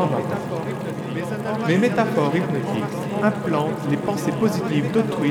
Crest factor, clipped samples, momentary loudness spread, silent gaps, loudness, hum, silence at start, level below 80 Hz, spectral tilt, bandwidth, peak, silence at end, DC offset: 16 dB; under 0.1%; 8 LU; none; -22 LUFS; none; 0 s; -60 dBFS; -7 dB/octave; 18 kHz; -6 dBFS; 0 s; under 0.1%